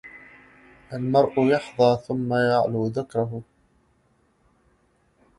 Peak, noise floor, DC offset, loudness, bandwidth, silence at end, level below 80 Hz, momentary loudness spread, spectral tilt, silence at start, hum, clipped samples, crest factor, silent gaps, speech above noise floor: -6 dBFS; -64 dBFS; under 0.1%; -23 LUFS; 11.5 kHz; 1.95 s; -60 dBFS; 12 LU; -7.5 dB/octave; 0.05 s; none; under 0.1%; 18 dB; none; 42 dB